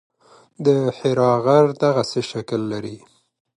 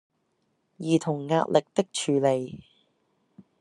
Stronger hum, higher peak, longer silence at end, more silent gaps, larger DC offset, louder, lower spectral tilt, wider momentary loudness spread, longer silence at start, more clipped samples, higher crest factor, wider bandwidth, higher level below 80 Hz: neither; first, -2 dBFS vs -6 dBFS; first, 0.6 s vs 0.2 s; neither; neither; first, -19 LUFS vs -26 LUFS; about the same, -6.5 dB/octave vs -5.5 dB/octave; about the same, 11 LU vs 13 LU; second, 0.6 s vs 0.8 s; neither; about the same, 18 dB vs 22 dB; about the same, 11.5 kHz vs 11.5 kHz; first, -62 dBFS vs -72 dBFS